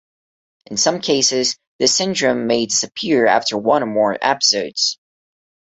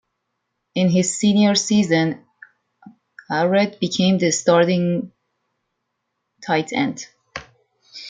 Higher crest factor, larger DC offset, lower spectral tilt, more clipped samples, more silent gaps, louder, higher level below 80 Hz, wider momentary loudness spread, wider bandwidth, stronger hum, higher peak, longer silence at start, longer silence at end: about the same, 18 dB vs 18 dB; neither; second, -2 dB/octave vs -5 dB/octave; neither; first, 1.67-1.79 s vs none; about the same, -17 LUFS vs -19 LUFS; about the same, -62 dBFS vs -62 dBFS; second, 5 LU vs 19 LU; second, 8.4 kHz vs 9.6 kHz; neither; about the same, -2 dBFS vs -2 dBFS; about the same, 0.7 s vs 0.75 s; first, 0.85 s vs 0 s